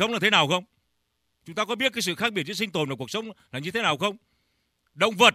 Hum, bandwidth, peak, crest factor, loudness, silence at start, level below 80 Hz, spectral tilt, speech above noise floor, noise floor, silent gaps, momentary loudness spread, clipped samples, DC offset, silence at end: none; 15.5 kHz; -2 dBFS; 24 dB; -25 LUFS; 0 s; -68 dBFS; -3 dB/octave; 49 dB; -74 dBFS; none; 12 LU; under 0.1%; under 0.1%; 0 s